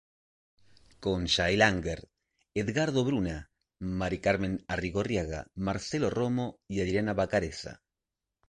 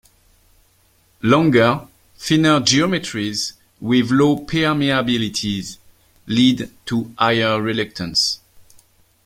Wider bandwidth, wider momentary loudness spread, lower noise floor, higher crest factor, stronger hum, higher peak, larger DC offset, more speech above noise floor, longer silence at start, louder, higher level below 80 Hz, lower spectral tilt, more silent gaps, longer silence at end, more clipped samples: second, 11 kHz vs 16 kHz; about the same, 12 LU vs 11 LU; first, -88 dBFS vs -58 dBFS; first, 24 dB vs 18 dB; neither; second, -8 dBFS vs -2 dBFS; neither; first, 59 dB vs 40 dB; second, 1 s vs 1.25 s; second, -30 LUFS vs -18 LUFS; about the same, -48 dBFS vs -50 dBFS; about the same, -5 dB/octave vs -4.5 dB/octave; neither; about the same, 0.75 s vs 0.65 s; neither